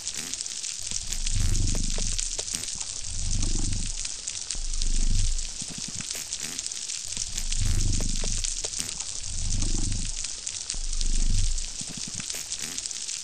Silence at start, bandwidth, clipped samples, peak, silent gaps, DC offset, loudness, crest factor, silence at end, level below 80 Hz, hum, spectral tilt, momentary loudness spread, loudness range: 0 s; 15 kHz; under 0.1%; -8 dBFS; none; 0.4%; -30 LUFS; 18 dB; 0 s; -28 dBFS; none; -2 dB/octave; 4 LU; 1 LU